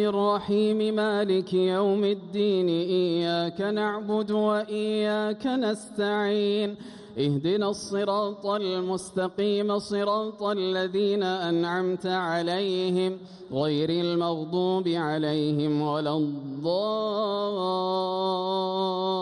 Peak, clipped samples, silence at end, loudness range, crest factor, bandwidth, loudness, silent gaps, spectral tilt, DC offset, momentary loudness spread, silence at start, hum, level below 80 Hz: -14 dBFS; under 0.1%; 0 s; 2 LU; 12 dB; 11.5 kHz; -26 LUFS; none; -6 dB/octave; under 0.1%; 4 LU; 0 s; none; -68 dBFS